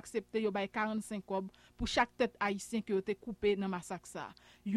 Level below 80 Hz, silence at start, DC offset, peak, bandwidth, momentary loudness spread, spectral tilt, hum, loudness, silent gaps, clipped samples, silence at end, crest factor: -58 dBFS; 0.05 s; under 0.1%; -16 dBFS; 13.5 kHz; 13 LU; -5 dB/octave; none; -36 LUFS; none; under 0.1%; 0 s; 20 dB